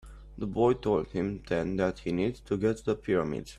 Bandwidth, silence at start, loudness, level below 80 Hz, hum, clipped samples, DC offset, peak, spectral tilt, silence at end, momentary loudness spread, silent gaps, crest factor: 12 kHz; 0.05 s; -30 LUFS; -50 dBFS; none; under 0.1%; under 0.1%; -12 dBFS; -7.5 dB/octave; 0 s; 7 LU; none; 18 dB